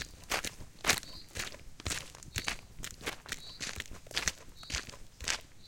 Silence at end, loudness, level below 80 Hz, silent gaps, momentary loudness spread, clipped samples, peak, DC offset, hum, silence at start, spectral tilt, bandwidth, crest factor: 0 s; -37 LUFS; -52 dBFS; none; 11 LU; under 0.1%; -8 dBFS; under 0.1%; none; 0 s; -1 dB/octave; 17 kHz; 32 dB